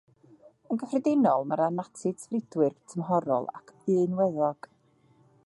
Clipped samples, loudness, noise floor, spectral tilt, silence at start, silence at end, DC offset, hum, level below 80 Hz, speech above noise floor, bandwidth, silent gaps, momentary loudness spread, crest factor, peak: under 0.1%; -28 LUFS; -64 dBFS; -8 dB/octave; 0.7 s; 0.9 s; under 0.1%; none; -76 dBFS; 36 dB; 11.5 kHz; none; 10 LU; 18 dB; -10 dBFS